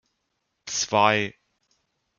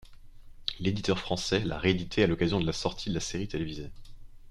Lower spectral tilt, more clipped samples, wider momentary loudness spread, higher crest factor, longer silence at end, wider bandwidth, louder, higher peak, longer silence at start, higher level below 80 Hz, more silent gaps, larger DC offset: second, -2.5 dB/octave vs -5 dB/octave; neither; first, 14 LU vs 10 LU; about the same, 24 dB vs 20 dB; first, 0.9 s vs 0 s; second, 10.5 kHz vs 13 kHz; first, -23 LUFS vs -30 LUFS; first, -4 dBFS vs -12 dBFS; first, 0.65 s vs 0 s; second, -68 dBFS vs -46 dBFS; neither; neither